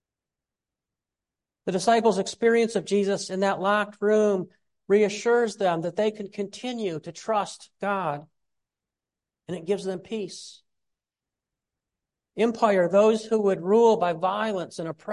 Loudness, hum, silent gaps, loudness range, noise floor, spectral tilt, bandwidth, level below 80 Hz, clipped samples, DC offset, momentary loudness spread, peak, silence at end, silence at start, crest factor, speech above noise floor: -24 LUFS; none; none; 12 LU; -90 dBFS; -5 dB/octave; 11.5 kHz; -74 dBFS; under 0.1%; under 0.1%; 14 LU; -6 dBFS; 0 s; 1.65 s; 18 dB; 66 dB